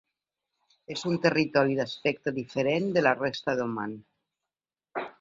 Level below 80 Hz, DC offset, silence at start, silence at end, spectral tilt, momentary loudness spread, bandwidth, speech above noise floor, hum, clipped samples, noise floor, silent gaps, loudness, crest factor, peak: -68 dBFS; under 0.1%; 0.9 s; 0.1 s; -6 dB/octave; 13 LU; 7.8 kHz; over 63 dB; none; under 0.1%; under -90 dBFS; none; -28 LUFS; 22 dB; -8 dBFS